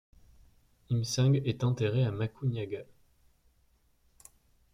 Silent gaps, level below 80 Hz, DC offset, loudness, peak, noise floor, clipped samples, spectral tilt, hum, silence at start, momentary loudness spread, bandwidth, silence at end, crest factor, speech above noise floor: none; -62 dBFS; under 0.1%; -31 LUFS; -16 dBFS; -68 dBFS; under 0.1%; -6.5 dB/octave; none; 0.9 s; 10 LU; 12 kHz; 1.9 s; 16 dB; 39 dB